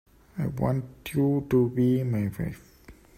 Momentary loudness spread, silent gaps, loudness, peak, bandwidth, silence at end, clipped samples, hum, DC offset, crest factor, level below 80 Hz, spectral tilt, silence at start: 12 LU; none; -27 LUFS; -12 dBFS; 16 kHz; 0.25 s; under 0.1%; none; under 0.1%; 16 dB; -52 dBFS; -8.5 dB/octave; 0.35 s